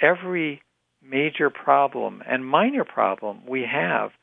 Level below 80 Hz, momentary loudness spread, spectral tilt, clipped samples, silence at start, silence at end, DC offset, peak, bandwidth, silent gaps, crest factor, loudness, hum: -82 dBFS; 9 LU; -8.5 dB/octave; under 0.1%; 0 s; 0.15 s; under 0.1%; -2 dBFS; 3.9 kHz; none; 20 dB; -23 LUFS; none